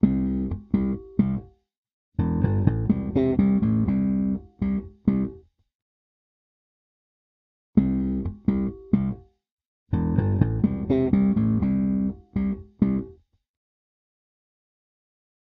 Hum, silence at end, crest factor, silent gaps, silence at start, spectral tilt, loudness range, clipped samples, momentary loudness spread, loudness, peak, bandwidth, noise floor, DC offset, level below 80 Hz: none; 2.35 s; 20 dB; 1.77-1.83 s, 1.93-2.12 s, 5.75-7.73 s, 9.51-9.57 s, 9.65-9.86 s; 0.05 s; -11 dB/octave; 7 LU; under 0.1%; 7 LU; -25 LUFS; -4 dBFS; 4 kHz; -45 dBFS; under 0.1%; -40 dBFS